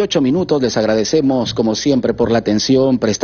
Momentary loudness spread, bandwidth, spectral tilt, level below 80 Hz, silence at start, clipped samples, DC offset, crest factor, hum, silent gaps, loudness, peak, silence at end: 3 LU; 7 kHz; -5 dB/octave; -44 dBFS; 0 s; under 0.1%; under 0.1%; 12 dB; none; none; -15 LUFS; -2 dBFS; 0 s